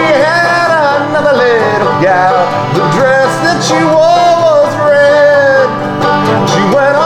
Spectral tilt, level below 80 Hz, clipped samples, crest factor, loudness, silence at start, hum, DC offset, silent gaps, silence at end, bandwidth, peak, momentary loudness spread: -5 dB/octave; -46 dBFS; under 0.1%; 8 dB; -8 LUFS; 0 s; none; under 0.1%; none; 0 s; 13 kHz; 0 dBFS; 4 LU